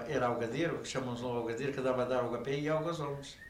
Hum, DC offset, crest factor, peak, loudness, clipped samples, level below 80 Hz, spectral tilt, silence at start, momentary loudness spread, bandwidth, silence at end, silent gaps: none; under 0.1%; 14 dB; -20 dBFS; -35 LUFS; under 0.1%; -62 dBFS; -5.5 dB/octave; 0 s; 5 LU; 16 kHz; 0 s; none